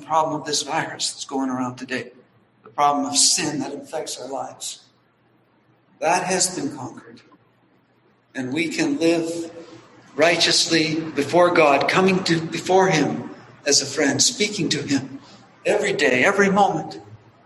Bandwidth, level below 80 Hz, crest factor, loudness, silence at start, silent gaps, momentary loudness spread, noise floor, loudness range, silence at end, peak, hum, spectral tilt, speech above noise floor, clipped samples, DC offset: 12.5 kHz; -64 dBFS; 20 dB; -20 LUFS; 0 s; none; 16 LU; -60 dBFS; 8 LU; 0.3 s; -2 dBFS; none; -3 dB/octave; 40 dB; under 0.1%; under 0.1%